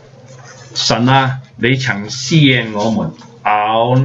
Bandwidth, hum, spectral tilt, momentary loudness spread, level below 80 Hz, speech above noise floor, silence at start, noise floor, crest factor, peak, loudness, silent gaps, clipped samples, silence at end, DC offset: 7.8 kHz; none; -5 dB/octave; 9 LU; -50 dBFS; 24 dB; 0.3 s; -38 dBFS; 14 dB; 0 dBFS; -14 LUFS; none; under 0.1%; 0 s; under 0.1%